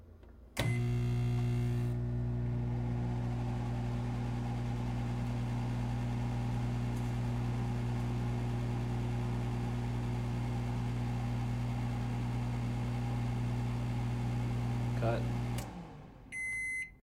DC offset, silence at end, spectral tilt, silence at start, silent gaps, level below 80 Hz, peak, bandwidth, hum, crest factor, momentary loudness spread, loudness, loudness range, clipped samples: under 0.1%; 0.05 s; -7 dB/octave; 0 s; none; -44 dBFS; -20 dBFS; 12.5 kHz; none; 16 dB; 3 LU; -36 LUFS; 1 LU; under 0.1%